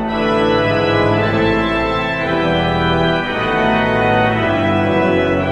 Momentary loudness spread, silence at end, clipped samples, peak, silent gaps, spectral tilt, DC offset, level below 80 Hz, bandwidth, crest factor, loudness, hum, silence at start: 2 LU; 0 s; under 0.1%; -2 dBFS; none; -7 dB/octave; under 0.1%; -36 dBFS; 10.5 kHz; 12 dB; -15 LUFS; none; 0 s